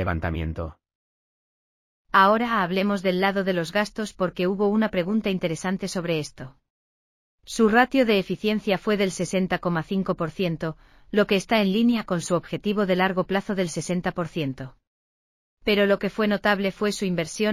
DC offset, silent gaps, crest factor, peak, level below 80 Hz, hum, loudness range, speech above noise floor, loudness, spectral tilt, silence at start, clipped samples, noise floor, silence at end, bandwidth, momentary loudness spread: under 0.1%; 0.95-2.05 s, 6.70-7.38 s, 14.87-15.57 s; 20 dB; -4 dBFS; -48 dBFS; none; 3 LU; over 67 dB; -24 LUFS; -5.5 dB/octave; 0 s; under 0.1%; under -90 dBFS; 0 s; 15.5 kHz; 10 LU